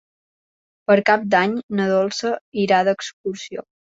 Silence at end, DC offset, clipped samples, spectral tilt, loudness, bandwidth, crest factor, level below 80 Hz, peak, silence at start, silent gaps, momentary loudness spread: 0.35 s; under 0.1%; under 0.1%; -5 dB/octave; -19 LUFS; 7.8 kHz; 18 dB; -66 dBFS; -2 dBFS; 0.9 s; 1.63-1.69 s, 2.41-2.52 s, 3.13-3.24 s; 14 LU